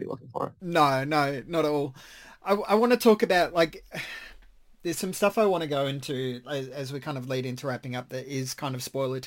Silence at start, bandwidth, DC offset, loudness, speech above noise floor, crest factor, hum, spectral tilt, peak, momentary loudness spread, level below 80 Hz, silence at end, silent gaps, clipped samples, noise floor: 0 s; 17 kHz; under 0.1%; -27 LUFS; 26 dB; 18 dB; none; -5 dB/octave; -8 dBFS; 14 LU; -60 dBFS; 0 s; none; under 0.1%; -53 dBFS